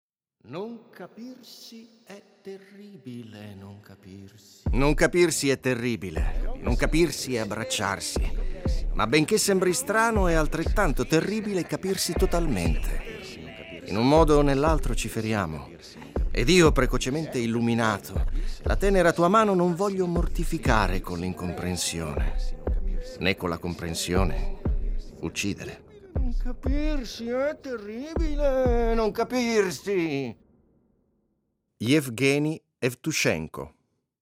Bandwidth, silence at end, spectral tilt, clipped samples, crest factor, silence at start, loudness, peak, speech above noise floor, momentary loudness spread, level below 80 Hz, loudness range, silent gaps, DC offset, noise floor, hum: 16.5 kHz; 0.55 s; -5 dB/octave; under 0.1%; 18 dB; 0.45 s; -26 LUFS; -8 dBFS; 50 dB; 19 LU; -32 dBFS; 7 LU; none; under 0.1%; -75 dBFS; none